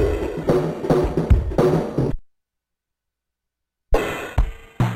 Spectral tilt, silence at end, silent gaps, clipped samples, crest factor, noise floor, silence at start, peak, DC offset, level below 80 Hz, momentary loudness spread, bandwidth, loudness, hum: -8 dB/octave; 0 s; none; under 0.1%; 18 dB; -82 dBFS; 0 s; -4 dBFS; under 0.1%; -26 dBFS; 7 LU; 15.5 kHz; -22 LUFS; none